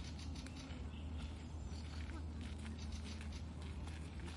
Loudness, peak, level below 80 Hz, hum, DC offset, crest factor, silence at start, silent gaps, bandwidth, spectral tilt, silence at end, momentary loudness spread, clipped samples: -49 LUFS; -36 dBFS; -52 dBFS; none; under 0.1%; 12 dB; 0 s; none; 11.5 kHz; -5.5 dB/octave; 0 s; 2 LU; under 0.1%